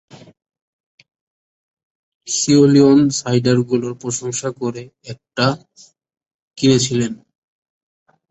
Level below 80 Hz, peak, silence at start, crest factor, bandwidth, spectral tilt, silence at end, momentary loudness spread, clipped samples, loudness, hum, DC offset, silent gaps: -56 dBFS; -2 dBFS; 2.25 s; 18 dB; 8.2 kHz; -5 dB/octave; 1.15 s; 19 LU; under 0.1%; -16 LUFS; none; under 0.1%; 6.34-6.51 s